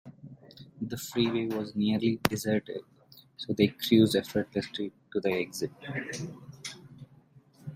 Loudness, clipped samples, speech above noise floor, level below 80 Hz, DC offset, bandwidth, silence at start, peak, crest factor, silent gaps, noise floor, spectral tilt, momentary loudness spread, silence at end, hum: -30 LUFS; under 0.1%; 30 dB; -64 dBFS; under 0.1%; 16 kHz; 0.05 s; 0 dBFS; 30 dB; none; -59 dBFS; -5.5 dB/octave; 18 LU; 0 s; none